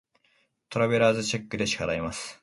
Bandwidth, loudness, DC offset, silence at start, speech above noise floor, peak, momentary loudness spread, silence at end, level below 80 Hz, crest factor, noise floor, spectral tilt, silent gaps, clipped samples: 11.5 kHz; -26 LUFS; under 0.1%; 0.7 s; 42 dB; -8 dBFS; 10 LU; 0.1 s; -54 dBFS; 20 dB; -69 dBFS; -4.5 dB/octave; none; under 0.1%